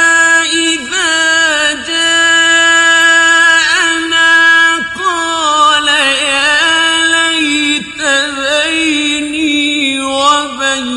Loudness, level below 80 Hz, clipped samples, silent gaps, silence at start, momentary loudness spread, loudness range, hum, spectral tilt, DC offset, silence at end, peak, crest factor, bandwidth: -9 LUFS; -48 dBFS; under 0.1%; none; 0 s; 7 LU; 4 LU; none; 0 dB/octave; under 0.1%; 0 s; 0 dBFS; 10 dB; 12 kHz